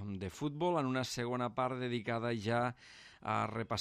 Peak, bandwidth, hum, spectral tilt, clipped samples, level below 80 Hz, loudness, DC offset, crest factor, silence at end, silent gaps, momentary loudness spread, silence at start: -22 dBFS; 14 kHz; none; -5.5 dB/octave; under 0.1%; -70 dBFS; -37 LUFS; under 0.1%; 16 dB; 0 s; none; 7 LU; 0 s